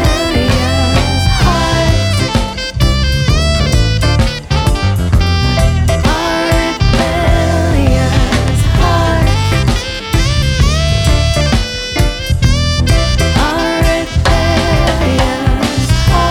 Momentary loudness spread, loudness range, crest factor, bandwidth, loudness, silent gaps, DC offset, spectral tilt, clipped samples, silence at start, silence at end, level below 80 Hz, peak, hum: 3 LU; 1 LU; 10 dB; 17 kHz; -12 LUFS; none; under 0.1%; -5 dB/octave; under 0.1%; 0 s; 0 s; -16 dBFS; 0 dBFS; none